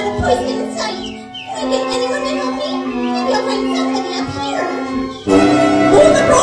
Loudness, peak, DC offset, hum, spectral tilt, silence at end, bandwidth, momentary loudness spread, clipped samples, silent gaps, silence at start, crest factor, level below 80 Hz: -16 LUFS; 0 dBFS; under 0.1%; none; -4.5 dB/octave; 0 s; 10.5 kHz; 12 LU; under 0.1%; none; 0 s; 16 dB; -40 dBFS